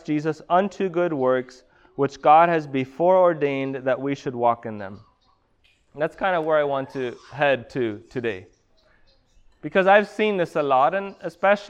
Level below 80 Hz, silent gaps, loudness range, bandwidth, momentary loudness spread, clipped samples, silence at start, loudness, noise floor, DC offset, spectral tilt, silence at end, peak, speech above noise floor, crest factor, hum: -62 dBFS; none; 6 LU; 9.2 kHz; 14 LU; under 0.1%; 0.05 s; -22 LUFS; -63 dBFS; under 0.1%; -6.5 dB/octave; 0 s; -4 dBFS; 42 dB; 18 dB; none